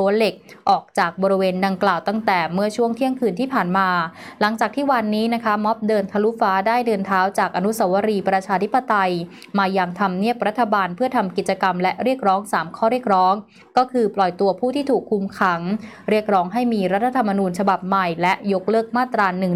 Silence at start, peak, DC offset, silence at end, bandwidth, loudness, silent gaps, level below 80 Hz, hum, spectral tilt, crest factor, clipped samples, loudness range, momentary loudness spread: 0 s; -6 dBFS; under 0.1%; 0 s; 15.5 kHz; -20 LUFS; none; -66 dBFS; none; -6 dB/octave; 14 dB; under 0.1%; 1 LU; 3 LU